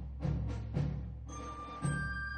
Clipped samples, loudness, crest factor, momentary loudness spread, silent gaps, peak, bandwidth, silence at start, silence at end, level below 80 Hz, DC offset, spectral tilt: under 0.1%; -39 LUFS; 16 dB; 8 LU; none; -22 dBFS; 10 kHz; 0 s; 0 s; -44 dBFS; under 0.1%; -6.5 dB/octave